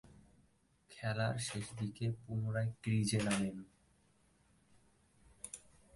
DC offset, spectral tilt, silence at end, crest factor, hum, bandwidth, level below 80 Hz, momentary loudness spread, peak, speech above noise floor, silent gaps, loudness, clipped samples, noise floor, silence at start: under 0.1%; -5 dB/octave; 0.35 s; 18 dB; none; 11.5 kHz; -66 dBFS; 17 LU; -22 dBFS; 35 dB; none; -38 LUFS; under 0.1%; -72 dBFS; 0.1 s